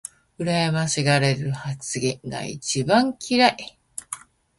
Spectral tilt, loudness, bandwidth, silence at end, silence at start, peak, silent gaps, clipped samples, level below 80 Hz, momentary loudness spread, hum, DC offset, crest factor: -4.5 dB/octave; -22 LUFS; 12 kHz; 0.4 s; 0.4 s; -2 dBFS; none; under 0.1%; -58 dBFS; 17 LU; none; under 0.1%; 22 dB